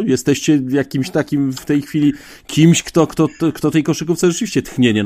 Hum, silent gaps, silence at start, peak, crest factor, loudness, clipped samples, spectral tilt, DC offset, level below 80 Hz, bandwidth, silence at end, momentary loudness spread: none; none; 0 s; 0 dBFS; 16 dB; -16 LUFS; under 0.1%; -5.5 dB/octave; under 0.1%; -48 dBFS; 15.5 kHz; 0 s; 7 LU